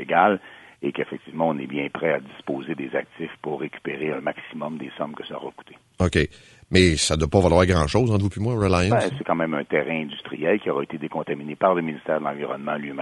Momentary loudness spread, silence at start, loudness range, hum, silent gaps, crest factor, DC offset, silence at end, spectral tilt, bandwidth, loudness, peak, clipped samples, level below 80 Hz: 13 LU; 0 s; 9 LU; none; none; 20 dB; under 0.1%; 0 s; -5.5 dB/octave; 11.5 kHz; -24 LUFS; -2 dBFS; under 0.1%; -42 dBFS